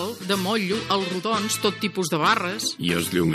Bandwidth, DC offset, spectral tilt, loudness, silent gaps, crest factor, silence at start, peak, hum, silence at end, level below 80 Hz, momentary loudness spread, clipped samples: 15.5 kHz; under 0.1%; -4 dB/octave; -23 LUFS; none; 20 dB; 0 s; -4 dBFS; none; 0 s; -58 dBFS; 4 LU; under 0.1%